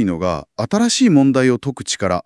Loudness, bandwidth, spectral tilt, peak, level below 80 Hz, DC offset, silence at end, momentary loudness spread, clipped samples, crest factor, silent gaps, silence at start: -16 LUFS; 12 kHz; -5 dB/octave; 0 dBFS; -52 dBFS; under 0.1%; 0.05 s; 10 LU; under 0.1%; 16 dB; none; 0 s